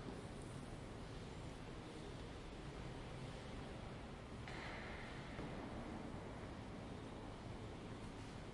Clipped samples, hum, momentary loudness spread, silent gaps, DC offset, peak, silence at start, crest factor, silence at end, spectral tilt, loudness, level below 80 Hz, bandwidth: under 0.1%; none; 3 LU; none; under 0.1%; -36 dBFS; 0 s; 16 dB; 0 s; -6 dB/octave; -52 LUFS; -58 dBFS; 11.5 kHz